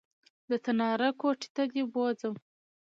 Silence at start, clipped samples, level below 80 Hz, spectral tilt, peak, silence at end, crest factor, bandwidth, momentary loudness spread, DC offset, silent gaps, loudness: 0.5 s; under 0.1%; -84 dBFS; -5 dB/octave; -16 dBFS; 0.5 s; 16 dB; 7.6 kHz; 7 LU; under 0.1%; 1.50-1.55 s; -31 LUFS